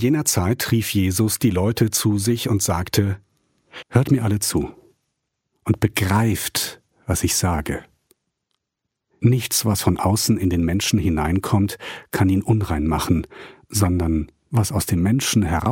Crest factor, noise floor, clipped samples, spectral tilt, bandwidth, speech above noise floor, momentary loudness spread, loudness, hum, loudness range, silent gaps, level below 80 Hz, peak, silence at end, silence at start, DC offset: 18 dB; -80 dBFS; under 0.1%; -5 dB/octave; 17 kHz; 61 dB; 7 LU; -20 LUFS; none; 3 LU; none; -38 dBFS; -2 dBFS; 0 s; 0 s; under 0.1%